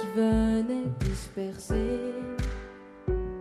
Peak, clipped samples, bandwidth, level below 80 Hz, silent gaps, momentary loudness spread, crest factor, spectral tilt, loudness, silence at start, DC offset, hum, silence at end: -12 dBFS; under 0.1%; 13.5 kHz; -36 dBFS; none; 11 LU; 16 dB; -7 dB/octave; -30 LUFS; 0 s; under 0.1%; none; 0 s